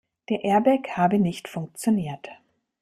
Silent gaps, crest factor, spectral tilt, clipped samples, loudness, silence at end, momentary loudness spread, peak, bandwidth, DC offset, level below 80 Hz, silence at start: none; 16 dB; -6.5 dB/octave; under 0.1%; -24 LUFS; 0.5 s; 14 LU; -8 dBFS; 15 kHz; under 0.1%; -64 dBFS; 0.3 s